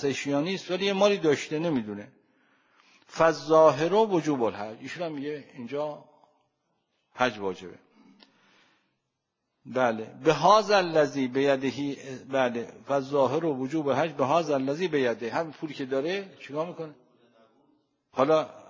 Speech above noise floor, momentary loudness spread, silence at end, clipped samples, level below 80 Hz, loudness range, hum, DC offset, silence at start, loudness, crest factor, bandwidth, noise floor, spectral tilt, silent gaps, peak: 55 dB; 16 LU; 0.1 s; under 0.1%; -72 dBFS; 10 LU; none; under 0.1%; 0 s; -26 LUFS; 20 dB; 7.6 kHz; -81 dBFS; -5.5 dB/octave; none; -6 dBFS